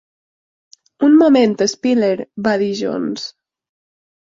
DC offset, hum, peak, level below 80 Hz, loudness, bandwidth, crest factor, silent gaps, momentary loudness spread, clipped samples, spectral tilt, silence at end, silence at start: under 0.1%; none; -2 dBFS; -60 dBFS; -15 LUFS; 7.8 kHz; 16 dB; none; 13 LU; under 0.1%; -5 dB/octave; 1 s; 1 s